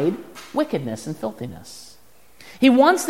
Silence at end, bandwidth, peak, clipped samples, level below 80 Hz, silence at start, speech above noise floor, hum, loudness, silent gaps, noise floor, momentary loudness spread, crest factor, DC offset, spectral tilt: 0 s; 16 kHz; -2 dBFS; under 0.1%; -62 dBFS; 0 s; 33 dB; none; -21 LUFS; none; -53 dBFS; 23 LU; 20 dB; 0.4%; -5 dB/octave